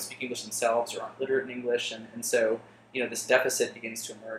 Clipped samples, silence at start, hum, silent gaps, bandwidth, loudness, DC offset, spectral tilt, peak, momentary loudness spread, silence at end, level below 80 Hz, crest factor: under 0.1%; 0 s; none; none; 16 kHz; -29 LUFS; under 0.1%; -2 dB/octave; -6 dBFS; 11 LU; 0 s; -76 dBFS; 24 dB